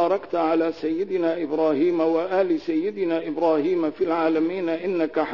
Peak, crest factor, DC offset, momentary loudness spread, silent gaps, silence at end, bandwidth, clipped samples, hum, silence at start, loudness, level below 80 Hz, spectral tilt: -10 dBFS; 14 dB; 0.3%; 4 LU; none; 0 s; 6 kHz; under 0.1%; none; 0 s; -23 LUFS; -66 dBFS; -7.5 dB/octave